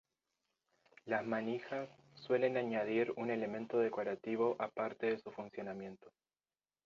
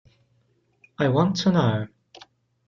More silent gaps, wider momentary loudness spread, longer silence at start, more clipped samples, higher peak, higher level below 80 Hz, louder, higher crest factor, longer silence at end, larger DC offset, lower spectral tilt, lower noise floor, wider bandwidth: neither; first, 12 LU vs 9 LU; about the same, 1.05 s vs 1 s; neither; second, -20 dBFS vs -8 dBFS; second, -84 dBFS vs -60 dBFS; second, -38 LUFS vs -22 LUFS; about the same, 20 dB vs 18 dB; about the same, 0.75 s vs 0.8 s; neither; second, -4.5 dB/octave vs -6.5 dB/octave; first, under -90 dBFS vs -66 dBFS; about the same, 7.2 kHz vs 7.4 kHz